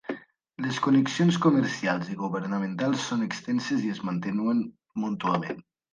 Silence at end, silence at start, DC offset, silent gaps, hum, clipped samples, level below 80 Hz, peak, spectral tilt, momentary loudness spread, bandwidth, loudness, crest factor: 0.35 s; 0.1 s; under 0.1%; none; none; under 0.1%; -70 dBFS; -10 dBFS; -6 dB/octave; 11 LU; 9.6 kHz; -27 LUFS; 18 dB